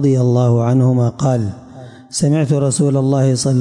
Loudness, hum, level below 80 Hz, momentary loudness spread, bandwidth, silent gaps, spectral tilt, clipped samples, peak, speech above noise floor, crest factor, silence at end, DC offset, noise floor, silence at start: -15 LUFS; none; -52 dBFS; 7 LU; 11.5 kHz; none; -7 dB/octave; under 0.1%; -6 dBFS; 22 dB; 10 dB; 0 s; under 0.1%; -36 dBFS; 0 s